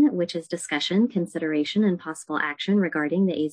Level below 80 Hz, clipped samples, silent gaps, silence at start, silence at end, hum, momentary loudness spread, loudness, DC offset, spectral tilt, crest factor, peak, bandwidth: -74 dBFS; under 0.1%; none; 0 s; 0 s; none; 6 LU; -25 LUFS; under 0.1%; -5.5 dB/octave; 12 dB; -10 dBFS; 10.5 kHz